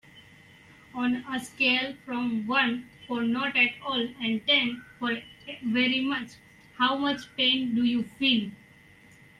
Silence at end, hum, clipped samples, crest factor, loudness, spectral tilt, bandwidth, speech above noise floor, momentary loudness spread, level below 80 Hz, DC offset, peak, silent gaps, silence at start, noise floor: 0.85 s; none; under 0.1%; 18 dB; -26 LUFS; -4 dB/octave; 12 kHz; 27 dB; 12 LU; -66 dBFS; under 0.1%; -10 dBFS; none; 0.15 s; -55 dBFS